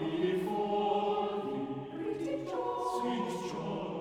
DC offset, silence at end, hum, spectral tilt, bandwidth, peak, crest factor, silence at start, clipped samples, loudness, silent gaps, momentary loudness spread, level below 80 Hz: under 0.1%; 0 s; none; -6 dB/octave; 15.5 kHz; -20 dBFS; 14 dB; 0 s; under 0.1%; -34 LUFS; none; 7 LU; -66 dBFS